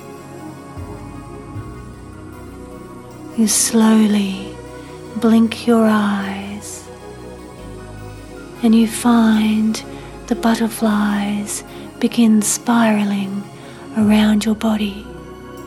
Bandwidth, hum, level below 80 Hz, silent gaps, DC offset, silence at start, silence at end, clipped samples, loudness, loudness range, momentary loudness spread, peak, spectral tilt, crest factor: 13.5 kHz; none; -44 dBFS; none; under 0.1%; 0 s; 0 s; under 0.1%; -16 LUFS; 5 LU; 21 LU; -2 dBFS; -4.5 dB/octave; 16 dB